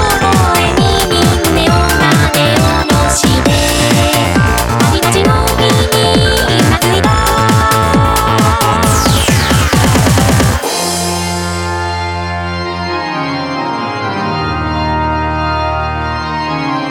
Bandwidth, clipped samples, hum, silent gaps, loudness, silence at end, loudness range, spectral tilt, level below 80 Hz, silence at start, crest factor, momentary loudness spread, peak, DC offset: 19 kHz; under 0.1%; none; none; -11 LUFS; 0 s; 6 LU; -4.5 dB/octave; -22 dBFS; 0 s; 10 dB; 7 LU; 0 dBFS; under 0.1%